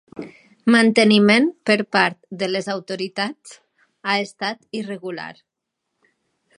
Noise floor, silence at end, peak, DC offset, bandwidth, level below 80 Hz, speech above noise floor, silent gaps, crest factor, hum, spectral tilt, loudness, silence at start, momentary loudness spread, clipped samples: -79 dBFS; 1.25 s; 0 dBFS; under 0.1%; 11 kHz; -70 dBFS; 60 dB; none; 20 dB; none; -5 dB/octave; -19 LUFS; 0.15 s; 19 LU; under 0.1%